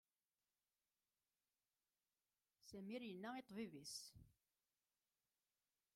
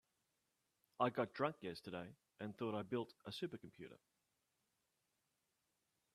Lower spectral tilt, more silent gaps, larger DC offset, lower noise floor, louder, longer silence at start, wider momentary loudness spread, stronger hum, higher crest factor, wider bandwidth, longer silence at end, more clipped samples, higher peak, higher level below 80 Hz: second, -4 dB/octave vs -6.5 dB/octave; neither; neither; about the same, under -90 dBFS vs -87 dBFS; second, -54 LUFS vs -45 LUFS; first, 2.65 s vs 1 s; second, 10 LU vs 17 LU; neither; second, 20 dB vs 26 dB; first, 16 kHz vs 13.5 kHz; second, 1.65 s vs 2.2 s; neither; second, -40 dBFS vs -22 dBFS; about the same, -86 dBFS vs -86 dBFS